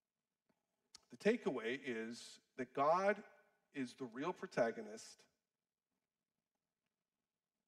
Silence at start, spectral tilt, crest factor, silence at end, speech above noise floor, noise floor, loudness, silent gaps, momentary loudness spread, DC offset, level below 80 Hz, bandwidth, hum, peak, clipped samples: 1.1 s; -5 dB/octave; 22 dB; 2.55 s; over 49 dB; under -90 dBFS; -41 LUFS; none; 17 LU; under 0.1%; -88 dBFS; 13 kHz; none; -22 dBFS; under 0.1%